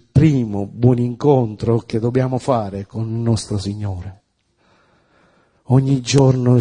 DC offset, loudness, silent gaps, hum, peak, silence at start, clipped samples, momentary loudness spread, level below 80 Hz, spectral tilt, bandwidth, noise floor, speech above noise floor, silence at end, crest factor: under 0.1%; -18 LUFS; none; none; 0 dBFS; 0.15 s; under 0.1%; 12 LU; -44 dBFS; -7.5 dB/octave; 10 kHz; -61 dBFS; 44 dB; 0 s; 18 dB